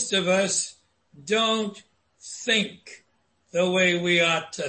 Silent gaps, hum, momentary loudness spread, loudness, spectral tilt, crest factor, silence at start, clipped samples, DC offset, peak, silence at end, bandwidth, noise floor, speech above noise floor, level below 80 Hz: none; none; 13 LU; -23 LUFS; -3 dB/octave; 16 dB; 0 s; under 0.1%; under 0.1%; -8 dBFS; 0 s; 8.8 kHz; -57 dBFS; 33 dB; -68 dBFS